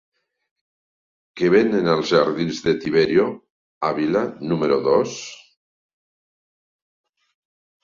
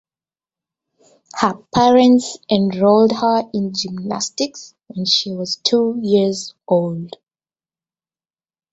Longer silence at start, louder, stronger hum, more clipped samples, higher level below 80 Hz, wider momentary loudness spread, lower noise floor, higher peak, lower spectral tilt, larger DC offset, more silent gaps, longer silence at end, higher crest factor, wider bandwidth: about the same, 1.35 s vs 1.35 s; second, -20 LUFS vs -17 LUFS; neither; neither; about the same, -58 dBFS vs -58 dBFS; second, 9 LU vs 12 LU; about the same, under -90 dBFS vs under -90 dBFS; about the same, -2 dBFS vs 0 dBFS; about the same, -6 dB/octave vs -5 dB/octave; neither; first, 3.50-3.81 s vs none; first, 2.5 s vs 1.65 s; about the same, 20 dB vs 18 dB; about the same, 7.4 kHz vs 8 kHz